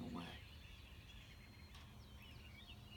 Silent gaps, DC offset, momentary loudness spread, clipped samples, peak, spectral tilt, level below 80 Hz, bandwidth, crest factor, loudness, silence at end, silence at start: none; under 0.1%; 7 LU; under 0.1%; -36 dBFS; -5 dB/octave; -62 dBFS; 18 kHz; 20 dB; -57 LUFS; 0 s; 0 s